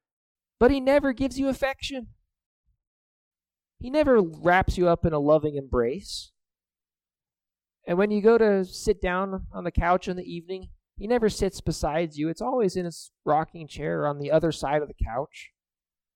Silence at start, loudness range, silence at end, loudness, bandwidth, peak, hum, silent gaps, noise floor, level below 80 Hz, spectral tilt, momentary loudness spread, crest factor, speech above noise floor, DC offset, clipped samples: 0.6 s; 4 LU; 0.7 s; -25 LUFS; 15.5 kHz; -6 dBFS; none; 2.46-2.64 s, 2.87-3.31 s; under -90 dBFS; -42 dBFS; -6 dB/octave; 14 LU; 20 dB; over 65 dB; under 0.1%; under 0.1%